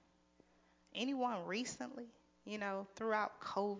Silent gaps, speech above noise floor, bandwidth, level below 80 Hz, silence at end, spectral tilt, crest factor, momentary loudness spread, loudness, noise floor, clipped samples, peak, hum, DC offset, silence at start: none; 31 dB; 7.8 kHz; -82 dBFS; 0 s; -4 dB/octave; 20 dB; 12 LU; -41 LUFS; -72 dBFS; under 0.1%; -24 dBFS; none; under 0.1%; 0.95 s